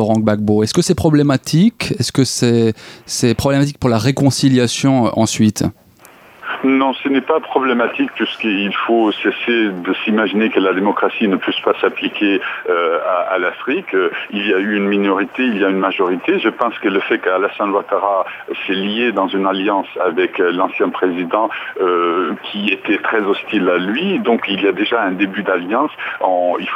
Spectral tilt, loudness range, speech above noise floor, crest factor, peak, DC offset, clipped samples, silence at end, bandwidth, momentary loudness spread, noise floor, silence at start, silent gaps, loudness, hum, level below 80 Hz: -5 dB/octave; 2 LU; 28 dB; 16 dB; 0 dBFS; under 0.1%; under 0.1%; 0 s; 16 kHz; 5 LU; -44 dBFS; 0 s; none; -16 LUFS; none; -52 dBFS